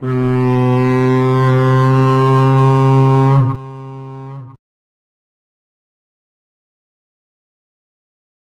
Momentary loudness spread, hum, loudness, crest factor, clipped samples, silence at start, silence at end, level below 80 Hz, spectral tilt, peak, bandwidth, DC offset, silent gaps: 19 LU; none; -12 LUFS; 12 dB; under 0.1%; 0 s; 4.05 s; -48 dBFS; -9 dB/octave; -2 dBFS; 6.8 kHz; under 0.1%; none